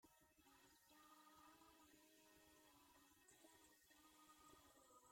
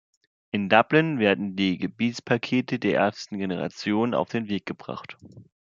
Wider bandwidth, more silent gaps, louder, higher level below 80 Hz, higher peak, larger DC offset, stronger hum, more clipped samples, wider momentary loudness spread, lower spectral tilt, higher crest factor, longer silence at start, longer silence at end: first, 16.5 kHz vs 7.6 kHz; neither; second, -69 LUFS vs -25 LUFS; second, -90 dBFS vs -70 dBFS; second, -56 dBFS vs -2 dBFS; neither; neither; neither; second, 1 LU vs 12 LU; second, -2 dB/octave vs -6 dB/octave; second, 16 dB vs 24 dB; second, 0 s vs 0.55 s; second, 0 s vs 0.3 s